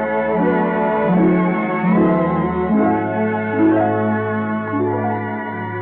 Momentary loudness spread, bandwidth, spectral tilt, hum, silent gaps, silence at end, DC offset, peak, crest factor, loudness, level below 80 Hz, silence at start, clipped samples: 6 LU; 4.1 kHz; -12 dB/octave; none; none; 0 s; under 0.1%; -6 dBFS; 10 dB; -18 LUFS; -46 dBFS; 0 s; under 0.1%